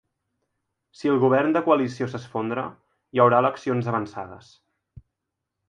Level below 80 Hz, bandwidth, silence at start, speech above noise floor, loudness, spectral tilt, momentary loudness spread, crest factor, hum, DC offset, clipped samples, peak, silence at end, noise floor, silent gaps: -64 dBFS; 9.4 kHz; 1 s; 60 dB; -23 LUFS; -7.5 dB/octave; 15 LU; 22 dB; none; under 0.1%; under 0.1%; -4 dBFS; 1.3 s; -83 dBFS; none